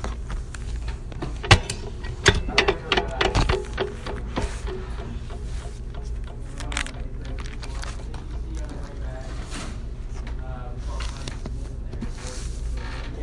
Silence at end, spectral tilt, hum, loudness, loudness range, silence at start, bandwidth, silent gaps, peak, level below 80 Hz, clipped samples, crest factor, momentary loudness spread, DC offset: 0 s; -4 dB/octave; none; -28 LUFS; 12 LU; 0 s; 11.5 kHz; none; 0 dBFS; -30 dBFS; under 0.1%; 26 dB; 15 LU; under 0.1%